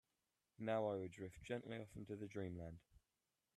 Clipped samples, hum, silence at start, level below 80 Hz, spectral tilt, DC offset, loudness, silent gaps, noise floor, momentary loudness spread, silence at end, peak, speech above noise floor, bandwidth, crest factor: under 0.1%; none; 0.6 s; -74 dBFS; -7 dB/octave; under 0.1%; -48 LUFS; none; under -90 dBFS; 12 LU; 0.6 s; -30 dBFS; over 43 dB; 13 kHz; 18 dB